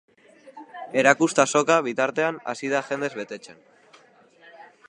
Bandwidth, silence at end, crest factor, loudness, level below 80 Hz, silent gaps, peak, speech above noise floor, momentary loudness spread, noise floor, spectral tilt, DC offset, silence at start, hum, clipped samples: 11 kHz; 0.25 s; 24 dB; -22 LUFS; -76 dBFS; none; 0 dBFS; 32 dB; 18 LU; -55 dBFS; -3.5 dB/octave; under 0.1%; 0.45 s; none; under 0.1%